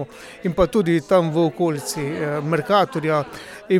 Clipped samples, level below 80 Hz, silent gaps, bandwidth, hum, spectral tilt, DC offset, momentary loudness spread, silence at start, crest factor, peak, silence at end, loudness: under 0.1%; -44 dBFS; none; 16 kHz; none; -6 dB/octave; under 0.1%; 10 LU; 0 s; 16 dB; -4 dBFS; 0 s; -20 LUFS